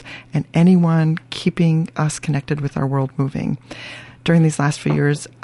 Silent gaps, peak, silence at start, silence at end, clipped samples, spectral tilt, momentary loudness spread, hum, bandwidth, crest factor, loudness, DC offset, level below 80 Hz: none; -2 dBFS; 0 s; 0.15 s; under 0.1%; -6.5 dB/octave; 11 LU; none; 11.5 kHz; 16 dB; -19 LUFS; under 0.1%; -50 dBFS